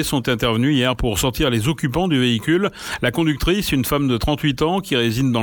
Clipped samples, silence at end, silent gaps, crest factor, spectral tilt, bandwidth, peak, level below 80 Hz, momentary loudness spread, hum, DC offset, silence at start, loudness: under 0.1%; 0 s; none; 14 dB; -5 dB/octave; 18 kHz; -4 dBFS; -34 dBFS; 3 LU; none; under 0.1%; 0 s; -19 LUFS